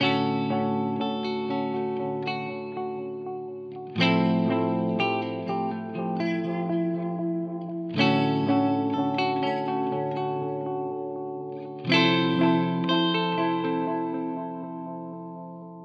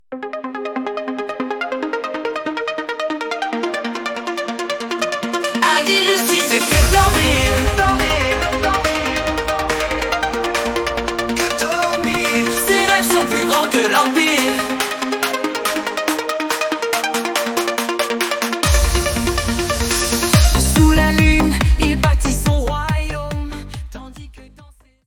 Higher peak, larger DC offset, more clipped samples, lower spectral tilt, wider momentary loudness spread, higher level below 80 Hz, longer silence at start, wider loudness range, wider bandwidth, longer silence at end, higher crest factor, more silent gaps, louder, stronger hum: second, -8 dBFS vs 0 dBFS; neither; neither; first, -7 dB/octave vs -4 dB/octave; first, 13 LU vs 10 LU; second, -80 dBFS vs -26 dBFS; about the same, 0 s vs 0.1 s; second, 4 LU vs 7 LU; second, 6.6 kHz vs 18 kHz; second, 0 s vs 0.45 s; about the same, 18 dB vs 18 dB; neither; second, -27 LUFS vs -17 LUFS; neither